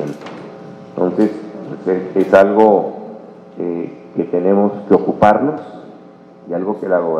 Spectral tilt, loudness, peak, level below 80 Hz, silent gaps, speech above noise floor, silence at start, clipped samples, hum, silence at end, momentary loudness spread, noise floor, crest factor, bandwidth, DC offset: -8.5 dB/octave; -15 LUFS; 0 dBFS; -58 dBFS; none; 27 dB; 0 s; 0.3%; none; 0 s; 22 LU; -40 dBFS; 16 dB; 9.4 kHz; under 0.1%